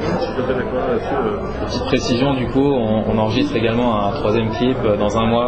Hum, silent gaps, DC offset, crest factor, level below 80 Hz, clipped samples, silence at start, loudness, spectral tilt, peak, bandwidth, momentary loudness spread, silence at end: none; none; under 0.1%; 14 dB; -34 dBFS; under 0.1%; 0 s; -18 LUFS; -6.5 dB/octave; -2 dBFS; 8.6 kHz; 4 LU; 0 s